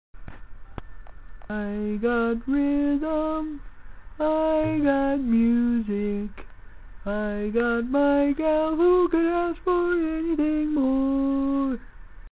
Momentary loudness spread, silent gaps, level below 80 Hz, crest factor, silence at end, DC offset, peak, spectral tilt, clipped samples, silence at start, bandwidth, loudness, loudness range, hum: 11 LU; none; -44 dBFS; 14 dB; 0.05 s; 0.5%; -12 dBFS; -11 dB/octave; under 0.1%; 0.15 s; 4 kHz; -24 LUFS; 4 LU; none